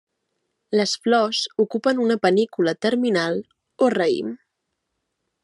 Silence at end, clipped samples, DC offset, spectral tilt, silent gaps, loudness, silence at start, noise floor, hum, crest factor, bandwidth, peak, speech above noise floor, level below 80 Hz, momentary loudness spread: 1.1 s; under 0.1%; under 0.1%; -4.5 dB/octave; none; -21 LUFS; 0.7 s; -78 dBFS; none; 16 dB; 11.5 kHz; -6 dBFS; 57 dB; -76 dBFS; 7 LU